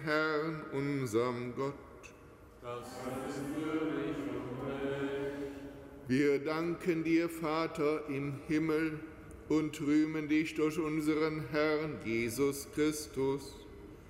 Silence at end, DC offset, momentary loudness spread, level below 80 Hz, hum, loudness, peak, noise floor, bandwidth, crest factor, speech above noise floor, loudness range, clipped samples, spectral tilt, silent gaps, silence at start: 0 s; under 0.1%; 14 LU; -60 dBFS; none; -34 LUFS; -20 dBFS; -55 dBFS; 16 kHz; 16 dB; 22 dB; 6 LU; under 0.1%; -6 dB/octave; none; 0 s